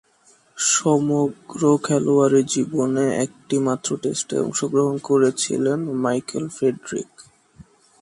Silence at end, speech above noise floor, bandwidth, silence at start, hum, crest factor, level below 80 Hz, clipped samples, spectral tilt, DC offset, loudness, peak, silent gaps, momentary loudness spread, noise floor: 0.4 s; 36 dB; 11.5 kHz; 0.55 s; none; 16 dB; -64 dBFS; under 0.1%; -4.5 dB/octave; under 0.1%; -21 LUFS; -6 dBFS; none; 8 LU; -57 dBFS